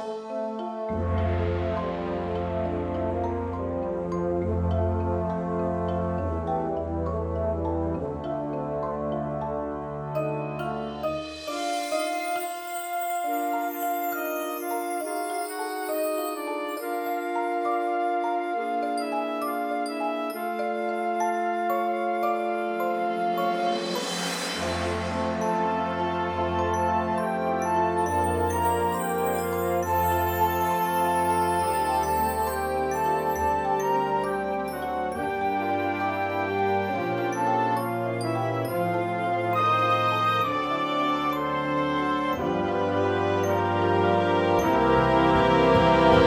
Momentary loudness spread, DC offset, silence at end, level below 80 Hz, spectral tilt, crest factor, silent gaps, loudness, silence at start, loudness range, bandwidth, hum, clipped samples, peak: 8 LU; under 0.1%; 0 s; -46 dBFS; -5.5 dB/octave; 20 dB; none; -26 LUFS; 0 s; 5 LU; over 20 kHz; none; under 0.1%; -6 dBFS